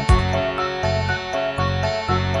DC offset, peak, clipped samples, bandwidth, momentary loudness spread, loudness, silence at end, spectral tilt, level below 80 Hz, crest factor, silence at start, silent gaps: under 0.1%; -4 dBFS; under 0.1%; 11.5 kHz; 4 LU; -21 LUFS; 0 s; -6 dB/octave; -28 dBFS; 18 dB; 0 s; none